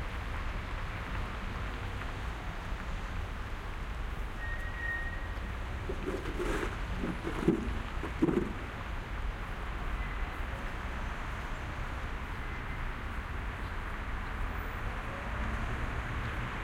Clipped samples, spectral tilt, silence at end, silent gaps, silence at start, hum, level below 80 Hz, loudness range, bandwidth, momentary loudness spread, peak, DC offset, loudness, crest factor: under 0.1%; -6 dB/octave; 0 s; none; 0 s; none; -38 dBFS; 5 LU; 16 kHz; 6 LU; -14 dBFS; under 0.1%; -38 LUFS; 22 dB